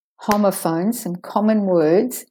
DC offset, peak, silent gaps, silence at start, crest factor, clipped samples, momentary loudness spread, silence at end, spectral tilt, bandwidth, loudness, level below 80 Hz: under 0.1%; -2 dBFS; none; 0.2 s; 18 dB; under 0.1%; 7 LU; 0.1 s; -6 dB/octave; 19.5 kHz; -19 LUFS; -60 dBFS